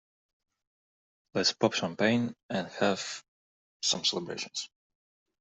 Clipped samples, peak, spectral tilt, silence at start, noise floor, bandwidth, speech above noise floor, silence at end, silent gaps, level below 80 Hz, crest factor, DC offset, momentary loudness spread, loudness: under 0.1%; -10 dBFS; -3 dB/octave; 1.35 s; under -90 dBFS; 8.2 kHz; over 60 dB; 0.75 s; 2.43-2.49 s, 3.28-3.80 s; -74 dBFS; 24 dB; under 0.1%; 11 LU; -30 LUFS